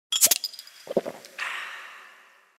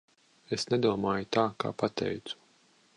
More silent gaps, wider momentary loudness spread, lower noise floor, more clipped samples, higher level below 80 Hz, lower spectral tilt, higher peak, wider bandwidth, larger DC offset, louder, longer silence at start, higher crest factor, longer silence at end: neither; first, 23 LU vs 11 LU; second, -54 dBFS vs -65 dBFS; neither; second, -78 dBFS vs -64 dBFS; second, 0.5 dB/octave vs -5.5 dB/octave; first, -4 dBFS vs -12 dBFS; first, 16.5 kHz vs 11 kHz; neither; first, -25 LUFS vs -31 LUFS; second, 0.1 s vs 0.5 s; first, 26 dB vs 20 dB; second, 0.5 s vs 0.65 s